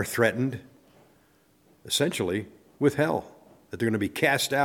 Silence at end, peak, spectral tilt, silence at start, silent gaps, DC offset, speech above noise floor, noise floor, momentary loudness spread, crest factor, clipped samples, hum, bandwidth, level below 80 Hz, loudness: 0 s; -8 dBFS; -4.5 dB/octave; 0 s; none; under 0.1%; 37 dB; -62 dBFS; 9 LU; 20 dB; under 0.1%; none; 18.5 kHz; -64 dBFS; -26 LUFS